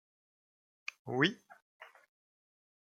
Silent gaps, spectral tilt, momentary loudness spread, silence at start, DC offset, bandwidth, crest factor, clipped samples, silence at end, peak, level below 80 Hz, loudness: 1.62-1.80 s; -5 dB/octave; 25 LU; 1.05 s; under 0.1%; 11 kHz; 28 dB; under 0.1%; 1.1 s; -14 dBFS; -84 dBFS; -35 LUFS